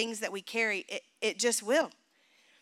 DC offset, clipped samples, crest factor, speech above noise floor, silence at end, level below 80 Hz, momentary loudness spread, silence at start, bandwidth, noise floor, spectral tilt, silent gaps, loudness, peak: under 0.1%; under 0.1%; 18 dB; 35 dB; 0.7 s; under -90 dBFS; 9 LU; 0 s; 16.5 kHz; -67 dBFS; -1 dB/octave; none; -31 LUFS; -16 dBFS